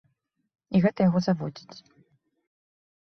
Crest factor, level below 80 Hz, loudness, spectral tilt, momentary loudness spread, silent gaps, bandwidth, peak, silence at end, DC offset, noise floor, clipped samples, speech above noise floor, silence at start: 20 dB; -62 dBFS; -25 LUFS; -8 dB/octave; 14 LU; none; 6.4 kHz; -8 dBFS; 1.25 s; under 0.1%; -73 dBFS; under 0.1%; 49 dB; 0.7 s